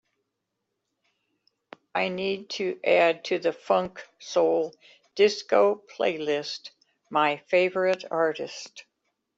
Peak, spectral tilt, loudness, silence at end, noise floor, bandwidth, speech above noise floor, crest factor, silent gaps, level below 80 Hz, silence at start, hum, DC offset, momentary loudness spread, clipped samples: -8 dBFS; -4 dB/octave; -26 LUFS; 0.55 s; -81 dBFS; 7.8 kHz; 56 dB; 18 dB; none; -74 dBFS; 1.95 s; none; under 0.1%; 14 LU; under 0.1%